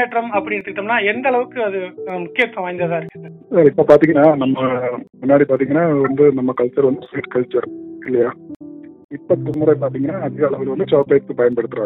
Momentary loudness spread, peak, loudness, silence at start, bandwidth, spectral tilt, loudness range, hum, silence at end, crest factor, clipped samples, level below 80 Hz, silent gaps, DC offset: 13 LU; 0 dBFS; -17 LUFS; 0 s; 5.2 kHz; -9 dB/octave; 6 LU; none; 0 s; 16 dB; under 0.1%; -58 dBFS; 8.56-8.60 s, 9.04-9.09 s; under 0.1%